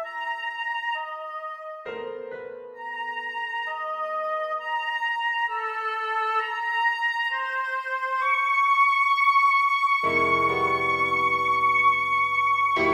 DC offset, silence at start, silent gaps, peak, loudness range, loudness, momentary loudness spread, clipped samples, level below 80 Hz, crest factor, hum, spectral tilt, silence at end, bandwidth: under 0.1%; 0 s; none; -10 dBFS; 11 LU; -23 LUFS; 15 LU; under 0.1%; -64 dBFS; 14 dB; none; -3.5 dB/octave; 0 s; 14 kHz